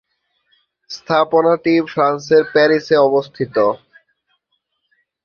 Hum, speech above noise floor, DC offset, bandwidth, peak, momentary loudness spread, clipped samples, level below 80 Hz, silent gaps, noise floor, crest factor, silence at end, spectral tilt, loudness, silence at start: none; 55 dB; under 0.1%; 7 kHz; -2 dBFS; 8 LU; under 0.1%; -62 dBFS; none; -70 dBFS; 16 dB; 1.5 s; -6 dB/octave; -15 LUFS; 0.9 s